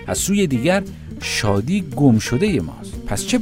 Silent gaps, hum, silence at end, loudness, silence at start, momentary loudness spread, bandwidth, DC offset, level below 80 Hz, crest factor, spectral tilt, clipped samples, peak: none; none; 0 s; -19 LUFS; 0 s; 12 LU; 16 kHz; under 0.1%; -38 dBFS; 18 dB; -5 dB/octave; under 0.1%; 0 dBFS